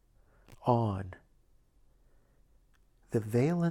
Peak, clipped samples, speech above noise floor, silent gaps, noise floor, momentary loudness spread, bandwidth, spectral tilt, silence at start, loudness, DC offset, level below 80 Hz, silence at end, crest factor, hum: -12 dBFS; under 0.1%; 36 dB; none; -65 dBFS; 10 LU; 14 kHz; -8.5 dB/octave; 0.5 s; -32 LUFS; under 0.1%; -64 dBFS; 0 s; 22 dB; none